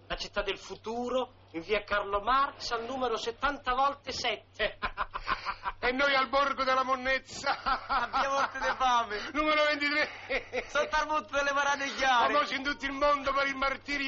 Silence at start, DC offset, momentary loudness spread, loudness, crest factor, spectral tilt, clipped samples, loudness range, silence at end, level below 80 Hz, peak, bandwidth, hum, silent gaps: 0.1 s; under 0.1%; 8 LU; -30 LUFS; 14 dB; 0 dB/octave; under 0.1%; 4 LU; 0 s; -50 dBFS; -16 dBFS; 7.4 kHz; none; none